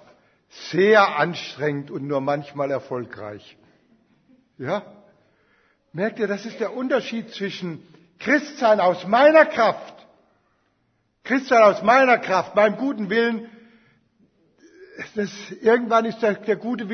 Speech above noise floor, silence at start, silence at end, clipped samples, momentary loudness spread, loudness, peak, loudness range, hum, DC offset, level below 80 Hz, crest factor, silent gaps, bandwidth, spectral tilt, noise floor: 48 dB; 0.55 s; 0 s; under 0.1%; 17 LU; -20 LUFS; 0 dBFS; 11 LU; none; under 0.1%; -72 dBFS; 22 dB; none; 6.6 kHz; -5.5 dB/octave; -69 dBFS